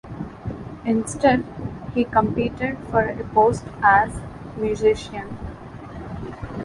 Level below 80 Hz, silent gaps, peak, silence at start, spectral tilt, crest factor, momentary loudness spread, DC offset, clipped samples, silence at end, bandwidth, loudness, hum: -42 dBFS; none; -4 dBFS; 0.05 s; -6 dB/octave; 20 dB; 16 LU; under 0.1%; under 0.1%; 0 s; 11.5 kHz; -21 LUFS; none